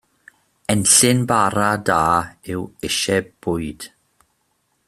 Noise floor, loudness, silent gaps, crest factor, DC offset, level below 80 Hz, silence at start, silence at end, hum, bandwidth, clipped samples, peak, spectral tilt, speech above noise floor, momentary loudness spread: -67 dBFS; -18 LUFS; none; 20 dB; under 0.1%; -50 dBFS; 0.7 s; 1 s; none; 15.5 kHz; under 0.1%; 0 dBFS; -3 dB/octave; 49 dB; 17 LU